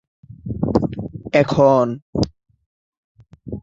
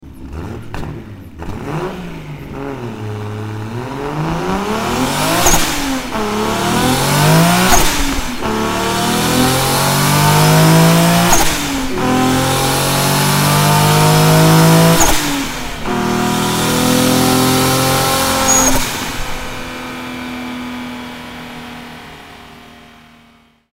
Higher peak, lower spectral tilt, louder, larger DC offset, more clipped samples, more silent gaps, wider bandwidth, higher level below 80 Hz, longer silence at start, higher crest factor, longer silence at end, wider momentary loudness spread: about the same, -2 dBFS vs 0 dBFS; first, -7.5 dB/octave vs -4 dB/octave; second, -19 LUFS vs -13 LUFS; neither; neither; first, 2.02-2.13 s, 2.66-3.15 s vs none; second, 7.8 kHz vs 16.5 kHz; second, -42 dBFS vs -28 dBFS; first, 0.3 s vs 0.05 s; first, 20 dB vs 14 dB; second, 0.05 s vs 1 s; about the same, 17 LU vs 18 LU